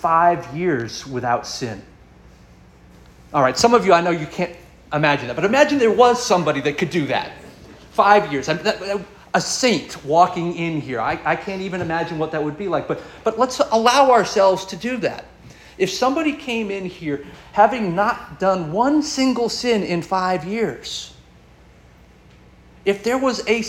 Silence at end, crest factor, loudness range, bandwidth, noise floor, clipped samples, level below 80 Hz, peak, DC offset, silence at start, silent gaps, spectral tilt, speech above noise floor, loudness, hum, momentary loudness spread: 0 s; 18 dB; 6 LU; 16.5 kHz; -48 dBFS; under 0.1%; -50 dBFS; -2 dBFS; under 0.1%; 0 s; none; -4.5 dB/octave; 29 dB; -19 LUFS; none; 12 LU